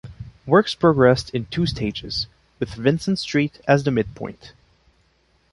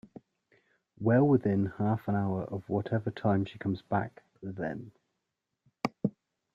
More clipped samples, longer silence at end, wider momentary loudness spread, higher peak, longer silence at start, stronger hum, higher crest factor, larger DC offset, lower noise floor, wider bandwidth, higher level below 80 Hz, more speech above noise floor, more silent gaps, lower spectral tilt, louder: neither; first, 1.05 s vs 0.45 s; first, 16 LU vs 12 LU; first, -2 dBFS vs -14 dBFS; second, 0.05 s vs 1 s; neither; about the same, 20 dB vs 18 dB; neither; second, -62 dBFS vs -85 dBFS; first, 11.5 kHz vs 7.6 kHz; first, -46 dBFS vs -66 dBFS; second, 42 dB vs 55 dB; neither; second, -6.5 dB/octave vs -9.5 dB/octave; first, -21 LUFS vs -31 LUFS